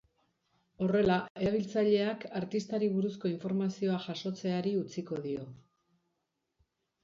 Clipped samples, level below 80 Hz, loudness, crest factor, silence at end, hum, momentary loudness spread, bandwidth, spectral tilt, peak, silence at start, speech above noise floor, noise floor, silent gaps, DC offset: under 0.1%; -64 dBFS; -32 LUFS; 18 dB; 1.5 s; none; 10 LU; 7.6 kHz; -7 dB/octave; -16 dBFS; 0.8 s; 51 dB; -83 dBFS; 1.30-1.35 s; under 0.1%